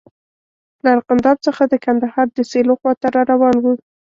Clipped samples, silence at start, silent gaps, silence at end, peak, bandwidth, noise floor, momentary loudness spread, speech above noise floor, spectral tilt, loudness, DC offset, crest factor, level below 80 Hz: under 0.1%; 0.85 s; 2.97-3.01 s; 0.4 s; -2 dBFS; 7.4 kHz; under -90 dBFS; 5 LU; over 75 dB; -6 dB/octave; -16 LUFS; under 0.1%; 14 dB; -56 dBFS